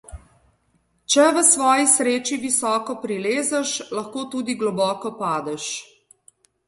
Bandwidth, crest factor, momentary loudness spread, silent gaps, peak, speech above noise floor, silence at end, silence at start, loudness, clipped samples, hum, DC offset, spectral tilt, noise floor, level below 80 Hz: 12 kHz; 20 dB; 14 LU; none; -2 dBFS; 45 dB; 0.85 s; 0.1 s; -20 LUFS; under 0.1%; none; under 0.1%; -2 dB/octave; -66 dBFS; -56 dBFS